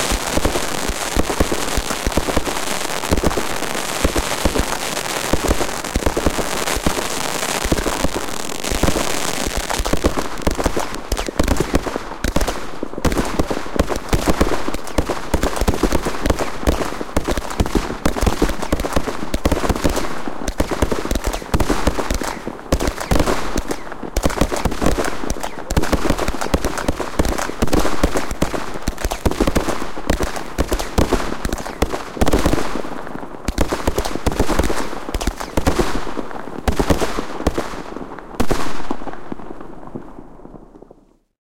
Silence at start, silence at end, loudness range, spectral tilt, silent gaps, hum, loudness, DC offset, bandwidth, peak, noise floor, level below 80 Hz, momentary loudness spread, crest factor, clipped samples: 0 s; 0.1 s; 2 LU; -4.5 dB/octave; none; none; -21 LUFS; under 0.1%; 17 kHz; 0 dBFS; -49 dBFS; -26 dBFS; 8 LU; 18 dB; under 0.1%